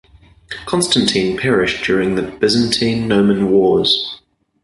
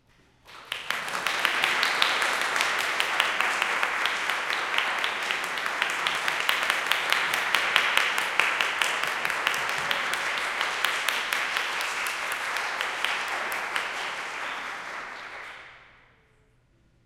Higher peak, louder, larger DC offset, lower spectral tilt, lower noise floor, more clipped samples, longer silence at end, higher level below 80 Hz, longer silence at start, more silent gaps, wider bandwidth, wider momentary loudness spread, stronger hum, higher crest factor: first, 0 dBFS vs -4 dBFS; first, -15 LUFS vs -25 LUFS; neither; first, -4.5 dB/octave vs 0.5 dB/octave; second, -36 dBFS vs -63 dBFS; neither; second, 0.45 s vs 1.2 s; first, -44 dBFS vs -66 dBFS; about the same, 0.5 s vs 0.45 s; neither; second, 11.5 kHz vs 17 kHz; about the same, 9 LU vs 9 LU; neither; second, 16 dB vs 24 dB